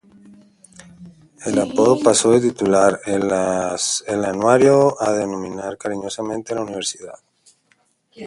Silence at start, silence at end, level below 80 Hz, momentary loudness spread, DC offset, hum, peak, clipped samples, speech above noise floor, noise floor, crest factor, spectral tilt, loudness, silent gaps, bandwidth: 1 s; 0 s; -56 dBFS; 13 LU; under 0.1%; none; 0 dBFS; under 0.1%; 44 dB; -62 dBFS; 18 dB; -4 dB/octave; -18 LUFS; none; 11.5 kHz